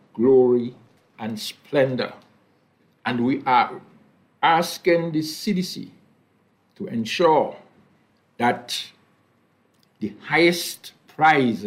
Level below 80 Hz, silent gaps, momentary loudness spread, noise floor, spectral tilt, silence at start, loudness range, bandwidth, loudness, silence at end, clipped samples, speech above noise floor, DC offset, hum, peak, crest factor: -68 dBFS; none; 17 LU; -63 dBFS; -5 dB/octave; 0.15 s; 3 LU; 16 kHz; -21 LUFS; 0 s; under 0.1%; 42 dB; under 0.1%; none; -4 dBFS; 18 dB